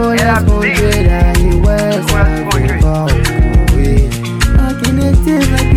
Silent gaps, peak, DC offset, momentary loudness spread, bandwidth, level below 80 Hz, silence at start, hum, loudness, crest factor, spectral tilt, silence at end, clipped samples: none; 0 dBFS; under 0.1%; 3 LU; 15.5 kHz; -14 dBFS; 0 s; none; -12 LUFS; 10 dB; -6 dB/octave; 0 s; under 0.1%